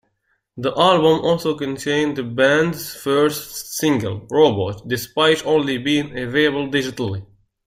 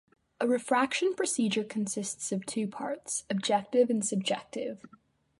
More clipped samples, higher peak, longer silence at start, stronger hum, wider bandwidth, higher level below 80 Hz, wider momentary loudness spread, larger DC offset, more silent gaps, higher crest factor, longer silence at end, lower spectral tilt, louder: neither; first, 0 dBFS vs -12 dBFS; first, 0.55 s vs 0.4 s; neither; first, 16 kHz vs 11.5 kHz; first, -54 dBFS vs -76 dBFS; about the same, 10 LU vs 9 LU; neither; neither; about the same, 18 dB vs 18 dB; about the same, 0.45 s vs 0.5 s; about the same, -4.5 dB/octave vs -3.5 dB/octave; first, -19 LUFS vs -30 LUFS